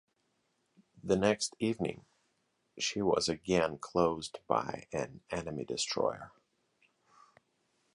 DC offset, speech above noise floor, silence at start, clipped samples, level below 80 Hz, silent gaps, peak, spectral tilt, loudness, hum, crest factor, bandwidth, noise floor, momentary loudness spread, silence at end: under 0.1%; 45 dB; 0.95 s; under 0.1%; -62 dBFS; none; -12 dBFS; -4 dB/octave; -33 LUFS; none; 22 dB; 11.5 kHz; -78 dBFS; 10 LU; 1.65 s